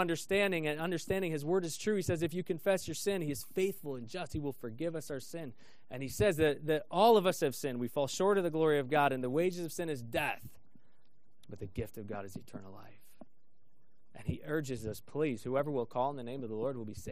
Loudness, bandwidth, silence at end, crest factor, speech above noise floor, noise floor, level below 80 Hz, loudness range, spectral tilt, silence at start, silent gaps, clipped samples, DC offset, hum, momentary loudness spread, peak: -34 LUFS; 15.5 kHz; 0 s; 20 dB; 42 dB; -76 dBFS; -60 dBFS; 13 LU; -5 dB/octave; 0 s; none; under 0.1%; 0.4%; none; 14 LU; -14 dBFS